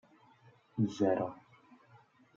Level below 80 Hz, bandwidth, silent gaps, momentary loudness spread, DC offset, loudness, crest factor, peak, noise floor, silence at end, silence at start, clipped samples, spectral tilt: -80 dBFS; 7.6 kHz; none; 15 LU; under 0.1%; -34 LUFS; 20 dB; -18 dBFS; -64 dBFS; 1 s; 0.75 s; under 0.1%; -7.5 dB/octave